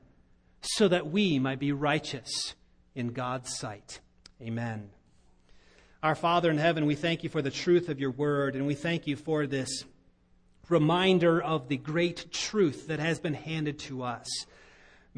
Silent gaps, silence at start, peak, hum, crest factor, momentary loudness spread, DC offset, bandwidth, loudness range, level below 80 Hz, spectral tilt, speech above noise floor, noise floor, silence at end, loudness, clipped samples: none; 0.65 s; -10 dBFS; none; 20 dB; 12 LU; under 0.1%; 10.5 kHz; 8 LU; -62 dBFS; -5 dB/octave; 34 dB; -63 dBFS; 0 s; -29 LUFS; under 0.1%